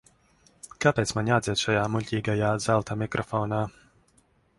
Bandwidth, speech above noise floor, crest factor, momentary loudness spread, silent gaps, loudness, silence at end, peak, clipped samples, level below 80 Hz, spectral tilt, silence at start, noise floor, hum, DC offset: 11.5 kHz; 39 dB; 22 dB; 6 LU; none; -26 LUFS; 0.9 s; -4 dBFS; under 0.1%; -54 dBFS; -5 dB/octave; 0.65 s; -64 dBFS; none; under 0.1%